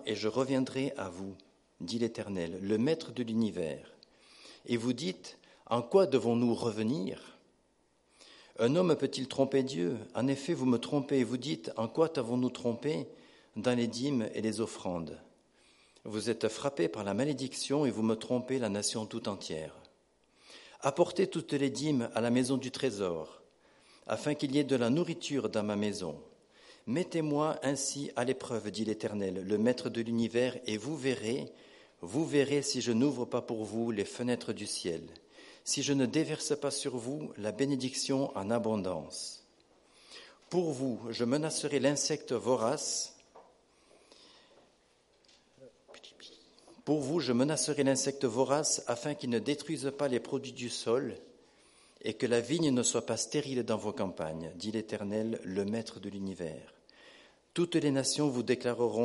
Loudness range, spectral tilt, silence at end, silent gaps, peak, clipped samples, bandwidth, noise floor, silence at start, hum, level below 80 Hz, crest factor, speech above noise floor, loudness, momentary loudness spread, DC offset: 4 LU; -4.5 dB/octave; 0 s; none; -14 dBFS; under 0.1%; 11.5 kHz; -71 dBFS; 0 s; none; -72 dBFS; 20 dB; 39 dB; -33 LUFS; 12 LU; under 0.1%